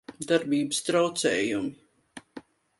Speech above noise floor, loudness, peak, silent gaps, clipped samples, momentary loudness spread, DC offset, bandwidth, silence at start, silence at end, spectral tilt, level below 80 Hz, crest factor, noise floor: 24 dB; -26 LUFS; -10 dBFS; none; under 0.1%; 20 LU; under 0.1%; 11.5 kHz; 0.1 s; 0.4 s; -3.5 dB/octave; -68 dBFS; 20 dB; -50 dBFS